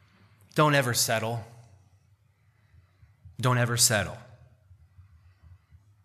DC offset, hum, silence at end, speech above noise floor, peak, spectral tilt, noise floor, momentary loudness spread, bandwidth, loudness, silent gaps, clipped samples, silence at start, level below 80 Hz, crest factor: under 0.1%; none; 1.85 s; 40 dB; -6 dBFS; -3.5 dB/octave; -65 dBFS; 15 LU; 15 kHz; -25 LUFS; none; under 0.1%; 0.55 s; -62 dBFS; 26 dB